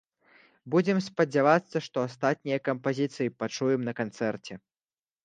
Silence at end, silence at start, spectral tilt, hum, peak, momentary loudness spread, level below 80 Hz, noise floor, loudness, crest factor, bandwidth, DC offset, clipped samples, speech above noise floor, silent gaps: 0.7 s; 0.65 s; -6 dB/octave; none; -8 dBFS; 9 LU; -74 dBFS; under -90 dBFS; -28 LUFS; 22 dB; 9.4 kHz; under 0.1%; under 0.1%; over 62 dB; none